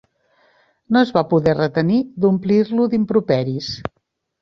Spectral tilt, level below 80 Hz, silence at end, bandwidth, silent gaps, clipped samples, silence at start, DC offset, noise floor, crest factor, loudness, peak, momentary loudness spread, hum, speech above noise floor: -7.5 dB/octave; -52 dBFS; 0.55 s; 6.6 kHz; none; under 0.1%; 0.9 s; under 0.1%; -59 dBFS; 16 dB; -18 LUFS; -2 dBFS; 9 LU; none; 42 dB